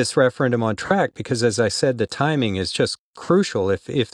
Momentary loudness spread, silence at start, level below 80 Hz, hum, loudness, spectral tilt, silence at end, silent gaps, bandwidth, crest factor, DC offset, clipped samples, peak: 4 LU; 0 s; -54 dBFS; none; -21 LUFS; -5 dB/octave; 0.05 s; 2.99-3.13 s; 12.5 kHz; 16 dB; under 0.1%; under 0.1%; -4 dBFS